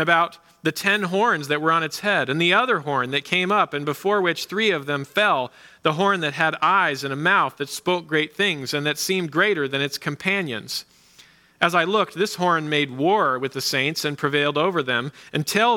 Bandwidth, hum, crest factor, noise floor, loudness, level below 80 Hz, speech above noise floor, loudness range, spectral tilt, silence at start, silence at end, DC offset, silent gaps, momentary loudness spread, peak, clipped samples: 18 kHz; none; 20 dB; -53 dBFS; -21 LUFS; -70 dBFS; 31 dB; 3 LU; -4 dB/octave; 0 s; 0 s; under 0.1%; none; 6 LU; -2 dBFS; under 0.1%